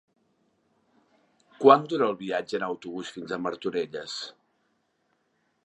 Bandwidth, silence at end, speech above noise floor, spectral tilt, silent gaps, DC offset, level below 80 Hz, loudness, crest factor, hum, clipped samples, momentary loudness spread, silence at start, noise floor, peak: 8.8 kHz; 1.35 s; 47 dB; -5 dB/octave; none; under 0.1%; -76 dBFS; -26 LUFS; 26 dB; none; under 0.1%; 17 LU; 1.6 s; -73 dBFS; -2 dBFS